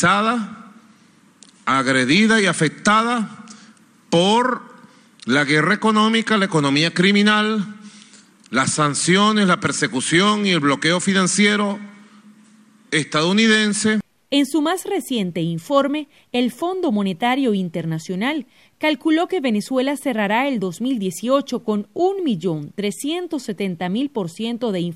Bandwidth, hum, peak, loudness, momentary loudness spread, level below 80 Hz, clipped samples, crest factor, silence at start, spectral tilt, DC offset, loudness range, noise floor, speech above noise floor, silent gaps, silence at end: 14.5 kHz; none; -4 dBFS; -19 LUFS; 10 LU; -64 dBFS; under 0.1%; 16 dB; 0 s; -4 dB/octave; under 0.1%; 4 LU; -53 dBFS; 34 dB; none; 0 s